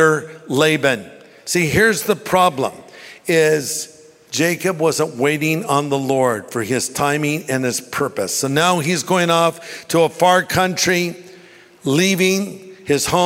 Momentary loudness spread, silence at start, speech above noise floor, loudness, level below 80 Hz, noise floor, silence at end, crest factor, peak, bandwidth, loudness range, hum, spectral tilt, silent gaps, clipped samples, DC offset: 11 LU; 0 s; 27 dB; -17 LUFS; -52 dBFS; -45 dBFS; 0 s; 16 dB; -2 dBFS; 16.5 kHz; 2 LU; none; -4 dB/octave; none; under 0.1%; under 0.1%